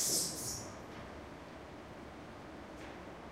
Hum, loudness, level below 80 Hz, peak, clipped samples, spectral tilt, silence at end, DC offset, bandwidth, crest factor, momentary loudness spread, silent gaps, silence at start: none; -42 LUFS; -60 dBFS; -22 dBFS; under 0.1%; -2 dB/octave; 0 s; under 0.1%; 16 kHz; 22 dB; 15 LU; none; 0 s